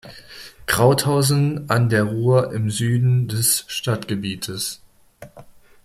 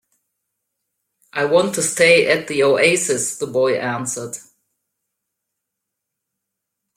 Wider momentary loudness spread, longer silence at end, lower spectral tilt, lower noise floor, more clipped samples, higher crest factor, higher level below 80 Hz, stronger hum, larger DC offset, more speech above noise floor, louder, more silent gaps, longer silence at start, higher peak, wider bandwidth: about the same, 13 LU vs 14 LU; second, 0.4 s vs 2.55 s; first, -5 dB/octave vs -3 dB/octave; second, -45 dBFS vs -80 dBFS; neither; about the same, 18 dB vs 20 dB; first, -50 dBFS vs -64 dBFS; neither; neither; second, 26 dB vs 63 dB; about the same, -19 LUFS vs -17 LUFS; neither; second, 0.05 s vs 1.35 s; about the same, -4 dBFS vs -2 dBFS; about the same, 16 kHz vs 16 kHz